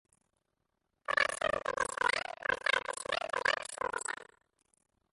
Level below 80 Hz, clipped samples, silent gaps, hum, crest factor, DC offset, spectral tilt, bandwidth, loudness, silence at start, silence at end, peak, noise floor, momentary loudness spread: -66 dBFS; under 0.1%; none; none; 22 dB; under 0.1%; -0.5 dB/octave; 11.5 kHz; -33 LUFS; 1.1 s; 0.9 s; -14 dBFS; -83 dBFS; 7 LU